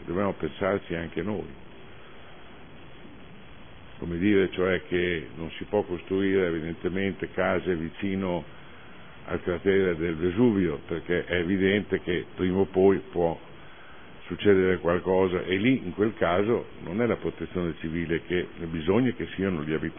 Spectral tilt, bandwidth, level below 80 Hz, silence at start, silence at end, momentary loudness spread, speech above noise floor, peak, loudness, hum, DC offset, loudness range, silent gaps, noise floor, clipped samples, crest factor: -11 dB/octave; 3.6 kHz; -52 dBFS; 0 s; 0 s; 17 LU; 22 dB; -8 dBFS; -27 LUFS; none; 0.5%; 6 LU; none; -48 dBFS; under 0.1%; 20 dB